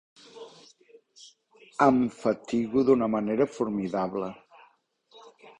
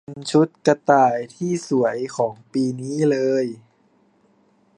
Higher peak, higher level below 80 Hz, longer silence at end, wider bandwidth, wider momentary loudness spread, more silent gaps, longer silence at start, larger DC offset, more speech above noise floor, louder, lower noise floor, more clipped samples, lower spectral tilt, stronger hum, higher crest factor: second, -6 dBFS vs -2 dBFS; about the same, -64 dBFS vs -68 dBFS; second, 0.1 s vs 1.2 s; second, 9.8 kHz vs 11 kHz; first, 23 LU vs 9 LU; neither; first, 0.35 s vs 0.1 s; neither; about the same, 39 dB vs 40 dB; second, -26 LUFS vs -21 LUFS; first, -64 dBFS vs -60 dBFS; neither; about the same, -7 dB/octave vs -6 dB/octave; neither; about the same, 22 dB vs 20 dB